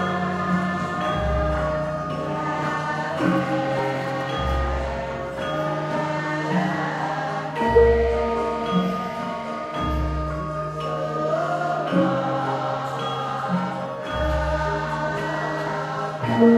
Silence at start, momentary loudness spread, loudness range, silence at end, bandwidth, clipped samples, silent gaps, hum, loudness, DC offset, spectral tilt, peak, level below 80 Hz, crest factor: 0 s; 6 LU; 3 LU; 0 s; 13.5 kHz; under 0.1%; none; none; -24 LUFS; under 0.1%; -7 dB/octave; -4 dBFS; -34 dBFS; 18 dB